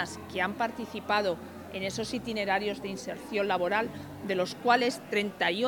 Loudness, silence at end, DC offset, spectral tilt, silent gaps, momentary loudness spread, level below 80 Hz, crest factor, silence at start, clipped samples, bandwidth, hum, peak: -30 LUFS; 0 s; under 0.1%; -4 dB/octave; none; 11 LU; -62 dBFS; 22 dB; 0 s; under 0.1%; 19.5 kHz; none; -10 dBFS